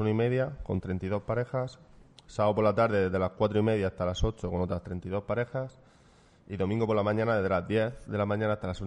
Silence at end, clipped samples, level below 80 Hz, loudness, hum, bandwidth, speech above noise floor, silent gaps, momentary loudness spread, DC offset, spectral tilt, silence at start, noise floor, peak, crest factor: 0 s; under 0.1%; -46 dBFS; -30 LUFS; none; 9.6 kHz; 31 dB; none; 9 LU; under 0.1%; -7.5 dB/octave; 0 s; -59 dBFS; -12 dBFS; 18 dB